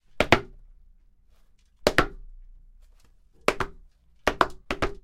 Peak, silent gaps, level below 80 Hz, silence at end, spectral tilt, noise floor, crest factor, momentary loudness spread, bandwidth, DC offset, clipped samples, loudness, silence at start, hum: -2 dBFS; none; -42 dBFS; 0.1 s; -4 dB/octave; -58 dBFS; 28 dB; 11 LU; 16 kHz; under 0.1%; under 0.1%; -26 LUFS; 0.15 s; none